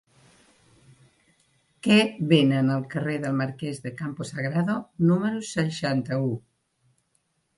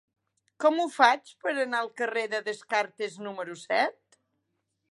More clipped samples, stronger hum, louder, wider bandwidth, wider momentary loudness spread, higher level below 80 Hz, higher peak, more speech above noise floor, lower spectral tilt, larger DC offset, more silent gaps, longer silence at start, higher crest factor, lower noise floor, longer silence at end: neither; neither; first, -25 LUFS vs -28 LUFS; about the same, 11.5 kHz vs 11.5 kHz; about the same, 13 LU vs 13 LU; first, -64 dBFS vs -90 dBFS; about the same, -6 dBFS vs -4 dBFS; about the same, 48 dB vs 51 dB; first, -6.5 dB/octave vs -3 dB/octave; neither; neither; first, 1.85 s vs 0.6 s; about the same, 22 dB vs 24 dB; second, -72 dBFS vs -79 dBFS; first, 1.2 s vs 1 s